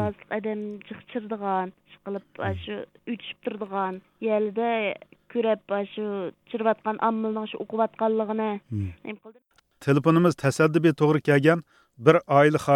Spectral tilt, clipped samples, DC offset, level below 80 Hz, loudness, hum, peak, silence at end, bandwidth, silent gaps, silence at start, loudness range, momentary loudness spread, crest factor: -7 dB/octave; under 0.1%; under 0.1%; -62 dBFS; -25 LUFS; none; -4 dBFS; 0 s; 13.5 kHz; none; 0 s; 10 LU; 16 LU; 22 dB